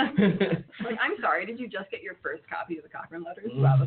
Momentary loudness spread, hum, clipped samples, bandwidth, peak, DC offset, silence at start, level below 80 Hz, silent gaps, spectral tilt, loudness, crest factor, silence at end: 14 LU; none; under 0.1%; 4.4 kHz; -10 dBFS; under 0.1%; 0 s; -62 dBFS; none; -6 dB/octave; -29 LUFS; 16 dB; 0 s